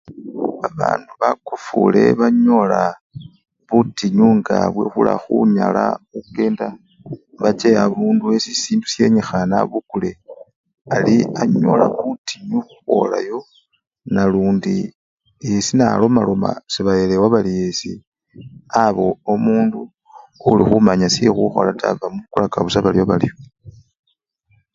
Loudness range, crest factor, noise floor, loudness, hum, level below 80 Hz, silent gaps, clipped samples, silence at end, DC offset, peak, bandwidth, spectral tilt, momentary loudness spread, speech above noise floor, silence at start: 3 LU; 18 dB; -63 dBFS; -17 LUFS; none; -48 dBFS; 3.01-3.10 s, 10.56-10.64 s, 10.81-10.85 s, 12.18-12.24 s, 13.87-13.91 s, 14.95-15.18 s, 18.07-18.12 s; under 0.1%; 1.05 s; under 0.1%; 0 dBFS; 7.8 kHz; -6 dB/octave; 12 LU; 47 dB; 0.1 s